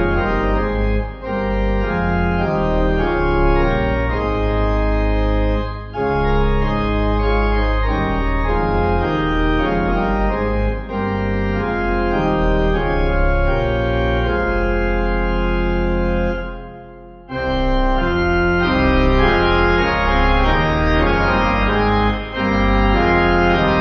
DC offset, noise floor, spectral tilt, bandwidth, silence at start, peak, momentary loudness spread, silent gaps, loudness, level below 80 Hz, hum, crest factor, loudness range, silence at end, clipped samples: under 0.1%; -37 dBFS; -8 dB/octave; 6.6 kHz; 0 s; -2 dBFS; 6 LU; none; -18 LUFS; -20 dBFS; none; 14 dB; 4 LU; 0 s; under 0.1%